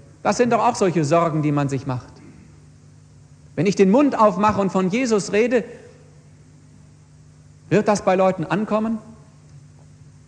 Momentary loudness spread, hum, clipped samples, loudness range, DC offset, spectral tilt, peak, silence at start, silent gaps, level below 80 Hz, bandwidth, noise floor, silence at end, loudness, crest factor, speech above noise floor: 11 LU; none; under 0.1%; 4 LU; under 0.1%; -6 dB/octave; -2 dBFS; 0.25 s; none; -54 dBFS; 10 kHz; -48 dBFS; 0.7 s; -19 LUFS; 18 dB; 29 dB